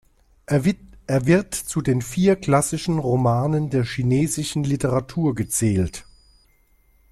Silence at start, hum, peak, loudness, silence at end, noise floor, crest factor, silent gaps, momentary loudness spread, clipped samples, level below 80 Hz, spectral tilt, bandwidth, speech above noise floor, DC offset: 0.5 s; none; -4 dBFS; -21 LUFS; 1.1 s; -59 dBFS; 18 dB; none; 5 LU; under 0.1%; -46 dBFS; -6 dB/octave; 14 kHz; 38 dB; under 0.1%